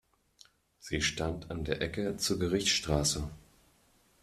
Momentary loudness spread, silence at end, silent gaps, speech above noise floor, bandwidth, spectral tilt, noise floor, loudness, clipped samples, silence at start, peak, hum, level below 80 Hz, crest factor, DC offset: 10 LU; 0.85 s; none; 35 dB; 14.5 kHz; -3.5 dB/octave; -67 dBFS; -32 LUFS; under 0.1%; 0.85 s; -14 dBFS; none; -48 dBFS; 22 dB; under 0.1%